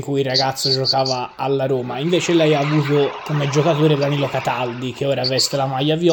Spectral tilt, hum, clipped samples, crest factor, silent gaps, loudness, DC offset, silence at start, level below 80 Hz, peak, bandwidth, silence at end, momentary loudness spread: -5 dB/octave; none; under 0.1%; 14 dB; none; -18 LUFS; under 0.1%; 0 s; -58 dBFS; -4 dBFS; 18.5 kHz; 0 s; 6 LU